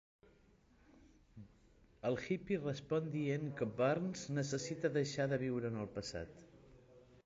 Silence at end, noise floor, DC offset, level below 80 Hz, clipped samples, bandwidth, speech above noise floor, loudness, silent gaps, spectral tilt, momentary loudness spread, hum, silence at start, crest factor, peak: 0.1 s; -69 dBFS; under 0.1%; -68 dBFS; under 0.1%; 7.8 kHz; 30 dB; -39 LUFS; none; -6 dB/octave; 11 LU; none; 1.05 s; 18 dB; -22 dBFS